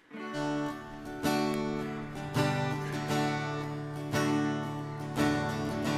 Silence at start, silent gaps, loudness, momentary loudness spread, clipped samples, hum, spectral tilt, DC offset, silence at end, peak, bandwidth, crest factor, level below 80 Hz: 0.1 s; none; -33 LUFS; 8 LU; under 0.1%; none; -5.5 dB/octave; under 0.1%; 0 s; -16 dBFS; 15.5 kHz; 16 dB; -58 dBFS